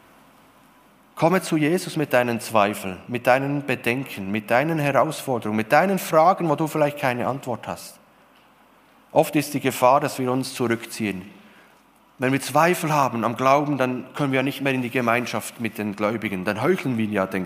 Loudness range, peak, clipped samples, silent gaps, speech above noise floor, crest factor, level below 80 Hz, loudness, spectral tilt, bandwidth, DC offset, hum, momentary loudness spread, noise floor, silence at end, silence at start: 3 LU; -2 dBFS; under 0.1%; none; 34 dB; 20 dB; -68 dBFS; -22 LUFS; -5.5 dB/octave; 15.5 kHz; under 0.1%; none; 9 LU; -55 dBFS; 0 s; 1.15 s